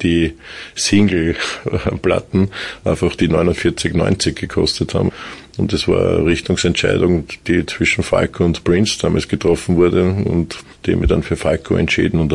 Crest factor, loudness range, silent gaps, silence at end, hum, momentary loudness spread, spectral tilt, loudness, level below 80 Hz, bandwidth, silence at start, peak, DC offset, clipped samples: 14 dB; 2 LU; none; 0 s; none; 6 LU; -5.5 dB/octave; -17 LUFS; -34 dBFS; 11.5 kHz; 0 s; -2 dBFS; 0.2%; under 0.1%